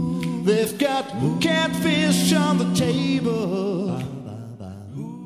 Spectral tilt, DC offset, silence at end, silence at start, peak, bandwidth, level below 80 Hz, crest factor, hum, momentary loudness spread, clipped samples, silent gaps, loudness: -5 dB/octave; under 0.1%; 0 s; 0 s; -6 dBFS; 15 kHz; -54 dBFS; 16 dB; none; 16 LU; under 0.1%; none; -21 LUFS